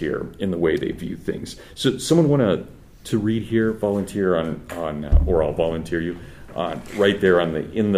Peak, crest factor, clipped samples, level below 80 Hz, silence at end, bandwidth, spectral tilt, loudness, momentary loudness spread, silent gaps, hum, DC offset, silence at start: -2 dBFS; 18 dB; under 0.1%; -30 dBFS; 0 s; 15.5 kHz; -6.5 dB/octave; -22 LUFS; 11 LU; none; none; under 0.1%; 0 s